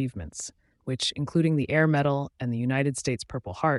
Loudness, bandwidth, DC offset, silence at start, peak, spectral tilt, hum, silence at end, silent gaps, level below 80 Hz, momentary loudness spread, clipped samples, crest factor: -27 LUFS; 11.5 kHz; under 0.1%; 0 s; -10 dBFS; -5.5 dB/octave; none; 0 s; none; -54 dBFS; 14 LU; under 0.1%; 18 dB